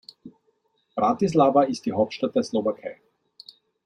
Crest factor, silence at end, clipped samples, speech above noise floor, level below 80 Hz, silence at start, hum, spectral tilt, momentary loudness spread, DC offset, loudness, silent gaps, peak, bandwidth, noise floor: 20 dB; 0.9 s; under 0.1%; 47 dB; -66 dBFS; 0.25 s; none; -6.5 dB/octave; 15 LU; under 0.1%; -23 LUFS; none; -6 dBFS; 10.5 kHz; -69 dBFS